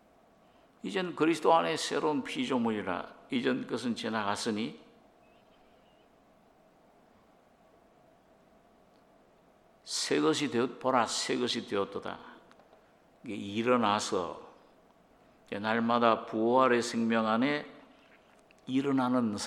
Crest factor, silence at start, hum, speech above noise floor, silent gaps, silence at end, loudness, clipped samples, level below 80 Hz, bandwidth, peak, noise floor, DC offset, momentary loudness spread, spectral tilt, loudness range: 24 dB; 0.85 s; none; 33 dB; none; 0 s; -30 LUFS; under 0.1%; -74 dBFS; 13.5 kHz; -8 dBFS; -63 dBFS; under 0.1%; 14 LU; -4 dB/octave; 8 LU